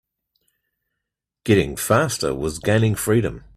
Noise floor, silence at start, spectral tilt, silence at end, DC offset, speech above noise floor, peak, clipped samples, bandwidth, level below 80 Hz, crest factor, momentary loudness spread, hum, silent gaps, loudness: -83 dBFS; 1.45 s; -5.5 dB/octave; 0.2 s; under 0.1%; 63 dB; -2 dBFS; under 0.1%; 16 kHz; -44 dBFS; 20 dB; 5 LU; none; none; -20 LUFS